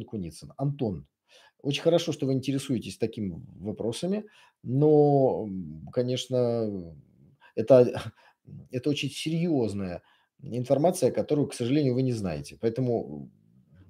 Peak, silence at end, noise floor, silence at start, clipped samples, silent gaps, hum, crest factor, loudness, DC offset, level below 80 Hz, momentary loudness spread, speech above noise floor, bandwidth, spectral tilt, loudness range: -6 dBFS; 0.6 s; -57 dBFS; 0 s; under 0.1%; none; none; 22 dB; -27 LUFS; under 0.1%; -62 dBFS; 17 LU; 31 dB; 16 kHz; -6.5 dB/octave; 3 LU